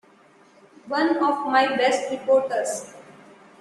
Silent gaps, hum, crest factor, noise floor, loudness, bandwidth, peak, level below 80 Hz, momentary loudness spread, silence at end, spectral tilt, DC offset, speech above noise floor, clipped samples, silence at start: none; none; 18 dB; -54 dBFS; -22 LUFS; 12.5 kHz; -6 dBFS; -72 dBFS; 9 LU; 0.5 s; -3 dB/octave; under 0.1%; 33 dB; under 0.1%; 0.85 s